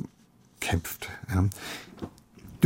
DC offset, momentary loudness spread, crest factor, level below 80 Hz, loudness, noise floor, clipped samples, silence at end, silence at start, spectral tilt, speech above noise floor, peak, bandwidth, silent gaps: under 0.1%; 15 LU; 24 dB; -54 dBFS; -32 LUFS; -59 dBFS; under 0.1%; 0 s; 0 s; -5.5 dB/octave; 30 dB; -8 dBFS; 16.5 kHz; none